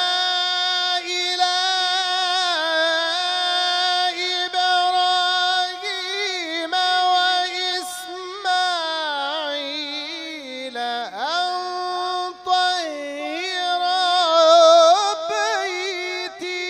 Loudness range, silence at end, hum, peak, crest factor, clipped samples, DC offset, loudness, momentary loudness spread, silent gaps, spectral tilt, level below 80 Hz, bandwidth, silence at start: 7 LU; 0 s; 50 Hz at -70 dBFS; -2 dBFS; 18 dB; under 0.1%; under 0.1%; -19 LUFS; 10 LU; none; 1 dB/octave; -72 dBFS; 15 kHz; 0 s